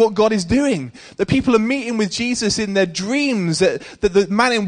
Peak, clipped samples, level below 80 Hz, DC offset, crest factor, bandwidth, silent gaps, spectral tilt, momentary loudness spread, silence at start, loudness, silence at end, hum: -2 dBFS; under 0.1%; -44 dBFS; under 0.1%; 16 dB; 10 kHz; none; -4.5 dB/octave; 5 LU; 0 s; -18 LUFS; 0 s; none